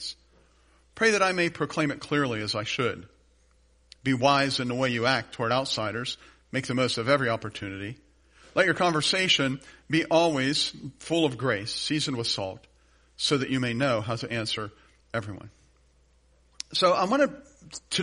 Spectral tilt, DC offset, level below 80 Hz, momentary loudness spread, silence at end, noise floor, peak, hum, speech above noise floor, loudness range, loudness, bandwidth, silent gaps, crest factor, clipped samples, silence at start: -4 dB/octave; under 0.1%; -60 dBFS; 15 LU; 0 s; -62 dBFS; -8 dBFS; none; 36 dB; 5 LU; -26 LUFS; 10.5 kHz; none; 20 dB; under 0.1%; 0 s